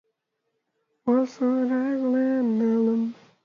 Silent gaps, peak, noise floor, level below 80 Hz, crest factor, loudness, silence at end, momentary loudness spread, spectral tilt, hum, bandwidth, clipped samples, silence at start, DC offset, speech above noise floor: none; -12 dBFS; -78 dBFS; -76 dBFS; 14 dB; -24 LUFS; 0.3 s; 4 LU; -8 dB/octave; none; 7 kHz; under 0.1%; 1.05 s; under 0.1%; 56 dB